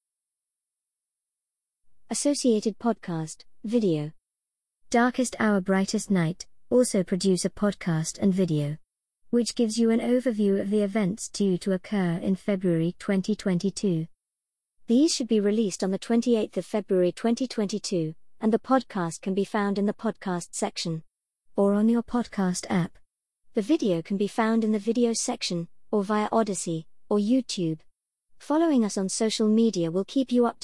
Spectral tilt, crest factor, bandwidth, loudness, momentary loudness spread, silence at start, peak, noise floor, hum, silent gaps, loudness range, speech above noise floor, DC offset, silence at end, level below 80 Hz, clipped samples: -5.5 dB/octave; 16 dB; 12 kHz; -26 LUFS; 8 LU; 2.1 s; -10 dBFS; -88 dBFS; none; none; 3 LU; 63 dB; 0.2%; 0.1 s; -62 dBFS; under 0.1%